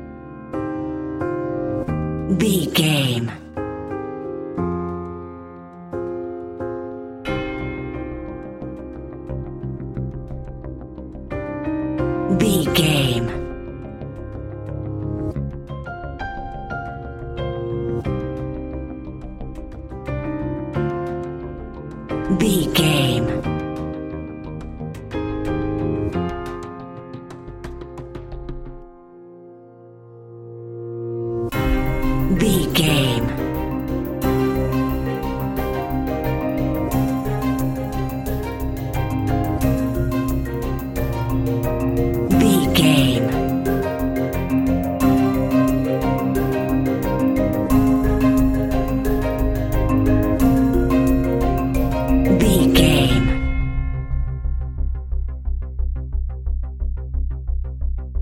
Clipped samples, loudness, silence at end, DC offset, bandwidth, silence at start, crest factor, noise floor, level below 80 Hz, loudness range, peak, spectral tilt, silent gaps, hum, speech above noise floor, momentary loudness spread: under 0.1%; -21 LUFS; 0 s; under 0.1%; 17 kHz; 0 s; 20 dB; -43 dBFS; -28 dBFS; 11 LU; 0 dBFS; -6 dB/octave; none; none; 25 dB; 16 LU